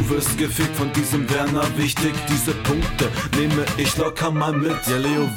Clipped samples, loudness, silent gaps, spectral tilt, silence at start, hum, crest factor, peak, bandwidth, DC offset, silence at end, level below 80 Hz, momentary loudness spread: under 0.1%; -21 LUFS; none; -4.5 dB/octave; 0 s; none; 14 dB; -6 dBFS; 17.5 kHz; under 0.1%; 0 s; -36 dBFS; 2 LU